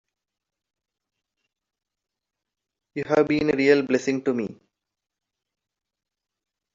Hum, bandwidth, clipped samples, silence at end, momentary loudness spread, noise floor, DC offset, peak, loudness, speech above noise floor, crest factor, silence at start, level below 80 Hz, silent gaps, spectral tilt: none; 7.6 kHz; under 0.1%; 2.2 s; 15 LU; -86 dBFS; under 0.1%; -4 dBFS; -22 LUFS; 65 dB; 22 dB; 2.95 s; -64 dBFS; none; -5 dB/octave